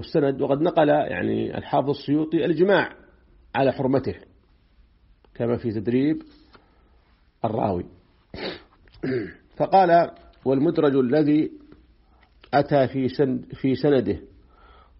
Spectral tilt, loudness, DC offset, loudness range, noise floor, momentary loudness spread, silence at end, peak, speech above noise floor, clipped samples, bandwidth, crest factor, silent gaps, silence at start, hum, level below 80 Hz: -6 dB/octave; -23 LUFS; under 0.1%; 7 LU; -59 dBFS; 13 LU; 0.75 s; -6 dBFS; 37 dB; under 0.1%; 5.8 kHz; 18 dB; none; 0 s; none; -54 dBFS